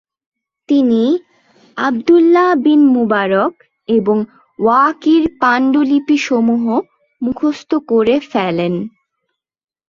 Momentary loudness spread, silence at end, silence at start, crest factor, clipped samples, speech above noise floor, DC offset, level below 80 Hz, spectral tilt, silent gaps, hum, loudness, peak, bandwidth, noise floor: 10 LU; 1 s; 0.7 s; 12 dB; under 0.1%; 61 dB; under 0.1%; -56 dBFS; -6.5 dB/octave; none; none; -14 LUFS; -2 dBFS; 7.2 kHz; -74 dBFS